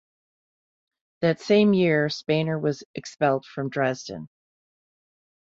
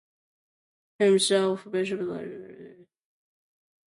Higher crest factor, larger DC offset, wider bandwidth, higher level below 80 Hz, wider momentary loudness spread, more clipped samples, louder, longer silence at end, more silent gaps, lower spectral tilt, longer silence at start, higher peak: about the same, 18 dB vs 18 dB; neither; second, 7.8 kHz vs 11.5 kHz; first, -66 dBFS vs -76 dBFS; second, 15 LU vs 20 LU; neither; about the same, -24 LUFS vs -25 LUFS; first, 1.35 s vs 1.15 s; first, 2.85-2.94 s vs none; first, -6.5 dB/octave vs -4 dB/octave; first, 1.2 s vs 1 s; about the same, -8 dBFS vs -10 dBFS